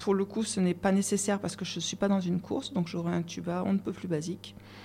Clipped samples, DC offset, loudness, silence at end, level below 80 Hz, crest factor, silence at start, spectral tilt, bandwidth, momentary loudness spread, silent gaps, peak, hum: under 0.1%; under 0.1%; -31 LUFS; 0 s; -64 dBFS; 18 dB; 0 s; -5 dB/octave; 14.5 kHz; 7 LU; none; -12 dBFS; none